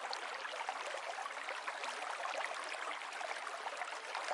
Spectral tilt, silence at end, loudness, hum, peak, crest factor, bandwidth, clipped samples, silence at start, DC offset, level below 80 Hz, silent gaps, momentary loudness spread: 1.5 dB/octave; 0 s; -42 LUFS; none; -24 dBFS; 18 dB; 11.5 kHz; under 0.1%; 0 s; under 0.1%; under -90 dBFS; none; 2 LU